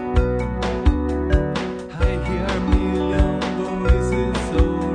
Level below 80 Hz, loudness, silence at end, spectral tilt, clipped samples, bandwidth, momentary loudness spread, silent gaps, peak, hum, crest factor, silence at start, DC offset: -22 dBFS; -21 LUFS; 0 s; -7 dB/octave; under 0.1%; 9.8 kHz; 4 LU; none; -4 dBFS; none; 16 dB; 0 s; under 0.1%